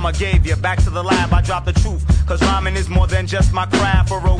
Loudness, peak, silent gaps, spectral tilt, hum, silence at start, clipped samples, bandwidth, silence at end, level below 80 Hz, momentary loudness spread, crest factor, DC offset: -17 LUFS; -2 dBFS; none; -5.5 dB/octave; none; 0 s; under 0.1%; 10.5 kHz; 0 s; -18 dBFS; 3 LU; 14 dB; under 0.1%